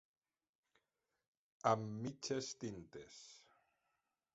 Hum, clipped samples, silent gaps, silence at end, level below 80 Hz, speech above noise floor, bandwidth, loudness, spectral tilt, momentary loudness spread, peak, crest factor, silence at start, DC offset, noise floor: none; under 0.1%; none; 0.95 s; -78 dBFS; 46 dB; 8 kHz; -42 LUFS; -5 dB/octave; 19 LU; -18 dBFS; 28 dB; 1.65 s; under 0.1%; -89 dBFS